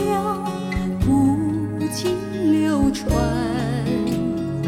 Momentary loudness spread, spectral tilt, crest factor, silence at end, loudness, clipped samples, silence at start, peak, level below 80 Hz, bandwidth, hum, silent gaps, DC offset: 7 LU; -6.5 dB/octave; 12 dB; 0 s; -21 LUFS; under 0.1%; 0 s; -8 dBFS; -34 dBFS; 16 kHz; none; none; under 0.1%